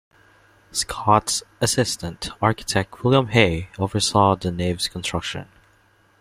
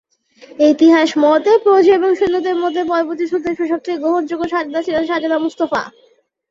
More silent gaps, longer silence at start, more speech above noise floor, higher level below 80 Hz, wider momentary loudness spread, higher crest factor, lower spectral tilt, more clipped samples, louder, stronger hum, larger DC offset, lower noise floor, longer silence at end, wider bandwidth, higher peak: neither; first, 0.75 s vs 0.6 s; first, 37 dB vs 29 dB; first, -48 dBFS vs -56 dBFS; about the same, 10 LU vs 9 LU; first, 20 dB vs 14 dB; about the same, -4 dB/octave vs -4.5 dB/octave; neither; second, -21 LUFS vs -15 LUFS; neither; neither; first, -58 dBFS vs -44 dBFS; first, 0.75 s vs 0.6 s; first, 16 kHz vs 7.6 kHz; about the same, -2 dBFS vs -2 dBFS